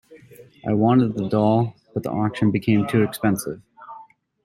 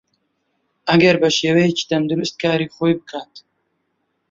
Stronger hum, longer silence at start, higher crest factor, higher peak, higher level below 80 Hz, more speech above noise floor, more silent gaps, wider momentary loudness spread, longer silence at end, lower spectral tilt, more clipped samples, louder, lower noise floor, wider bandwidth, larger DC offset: neither; second, 0.1 s vs 0.85 s; about the same, 16 dB vs 18 dB; second, -6 dBFS vs -2 dBFS; about the same, -58 dBFS vs -58 dBFS; second, 27 dB vs 53 dB; neither; first, 18 LU vs 12 LU; second, 0.4 s vs 0.9 s; first, -7 dB/octave vs -5 dB/octave; neither; second, -21 LUFS vs -17 LUFS; second, -47 dBFS vs -70 dBFS; first, 15.5 kHz vs 7.8 kHz; neither